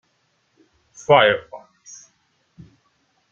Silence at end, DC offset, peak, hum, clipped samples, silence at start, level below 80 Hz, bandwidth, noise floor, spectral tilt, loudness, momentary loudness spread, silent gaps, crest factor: 1.75 s; under 0.1%; -2 dBFS; none; under 0.1%; 1.1 s; -64 dBFS; 7.4 kHz; -67 dBFS; -4 dB/octave; -16 LUFS; 28 LU; none; 22 dB